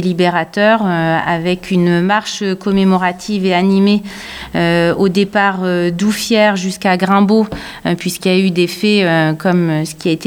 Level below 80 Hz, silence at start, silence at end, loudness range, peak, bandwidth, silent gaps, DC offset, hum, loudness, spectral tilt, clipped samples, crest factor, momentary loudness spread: -46 dBFS; 0 s; 0 s; 1 LU; 0 dBFS; 17 kHz; none; under 0.1%; none; -14 LUFS; -5.5 dB/octave; under 0.1%; 12 dB; 6 LU